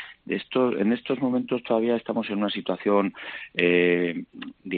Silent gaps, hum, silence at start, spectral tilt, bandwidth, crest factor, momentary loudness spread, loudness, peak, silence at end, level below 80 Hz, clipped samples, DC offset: none; none; 0 s; -4 dB/octave; 4.7 kHz; 20 dB; 11 LU; -25 LUFS; -6 dBFS; 0 s; -68 dBFS; under 0.1%; under 0.1%